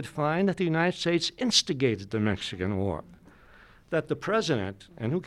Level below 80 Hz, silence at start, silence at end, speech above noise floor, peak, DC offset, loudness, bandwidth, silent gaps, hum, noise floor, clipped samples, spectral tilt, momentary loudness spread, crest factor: -58 dBFS; 0 s; 0 s; 27 dB; -10 dBFS; under 0.1%; -28 LUFS; 13.5 kHz; none; none; -54 dBFS; under 0.1%; -4.5 dB/octave; 8 LU; 20 dB